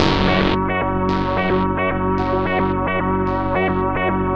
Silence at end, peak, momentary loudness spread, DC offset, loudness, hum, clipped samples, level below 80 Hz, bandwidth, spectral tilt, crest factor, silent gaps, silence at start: 0 s; 0 dBFS; 3 LU; under 0.1%; -19 LUFS; none; under 0.1%; -32 dBFS; 7.4 kHz; -7.5 dB/octave; 18 dB; none; 0 s